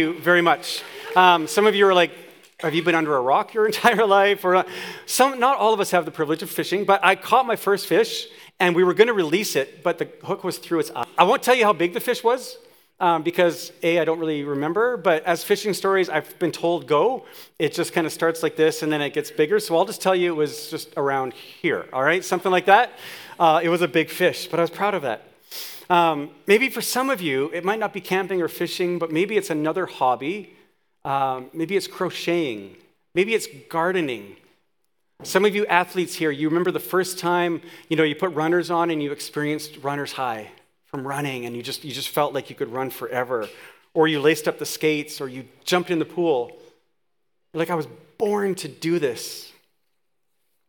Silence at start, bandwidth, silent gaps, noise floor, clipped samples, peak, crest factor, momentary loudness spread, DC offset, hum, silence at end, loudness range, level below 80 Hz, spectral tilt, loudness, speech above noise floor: 0 s; 19.5 kHz; none; -78 dBFS; under 0.1%; 0 dBFS; 22 dB; 12 LU; under 0.1%; none; 1.2 s; 7 LU; -78 dBFS; -4 dB/octave; -22 LUFS; 57 dB